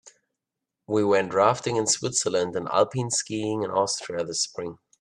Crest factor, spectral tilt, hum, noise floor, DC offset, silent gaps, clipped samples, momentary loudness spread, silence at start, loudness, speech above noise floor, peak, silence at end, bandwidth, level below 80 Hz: 22 dB; -3.5 dB/octave; none; -85 dBFS; under 0.1%; none; under 0.1%; 7 LU; 0.05 s; -25 LUFS; 61 dB; -4 dBFS; 0.25 s; 12.5 kHz; -68 dBFS